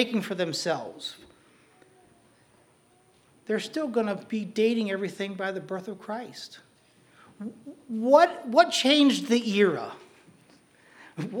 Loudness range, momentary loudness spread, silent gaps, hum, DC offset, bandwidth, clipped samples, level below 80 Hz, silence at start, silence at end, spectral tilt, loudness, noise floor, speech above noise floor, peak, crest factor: 12 LU; 21 LU; none; none; under 0.1%; 19 kHz; under 0.1%; -80 dBFS; 0 s; 0 s; -4.5 dB/octave; -26 LUFS; -62 dBFS; 36 dB; -4 dBFS; 24 dB